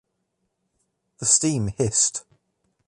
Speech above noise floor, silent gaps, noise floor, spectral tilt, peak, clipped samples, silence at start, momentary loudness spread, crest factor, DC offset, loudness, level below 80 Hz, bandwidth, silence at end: 54 dB; none; -76 dBFS; -3.5 dB/octave; -4 dBFS; under 0.1%; 1.2 s; 8 LU; 22 dB; under 0.1%; -20 LUFS; -52 dBFS; 11.5 kHz; 0.65 s